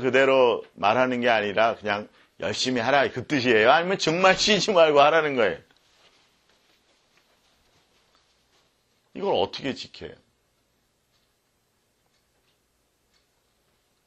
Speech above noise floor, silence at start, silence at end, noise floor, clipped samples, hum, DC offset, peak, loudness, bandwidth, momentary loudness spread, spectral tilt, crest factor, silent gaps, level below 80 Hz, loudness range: 48 dB; 0 s; 3.95 s; -70 dBFS; under 0.1%; none; under 0.1%; -2 dBFS; -22 LUFS; 9 kHz; 15 LU; -3.5 dB/octave; 22 dB; none; -62 dBFS; 14 LU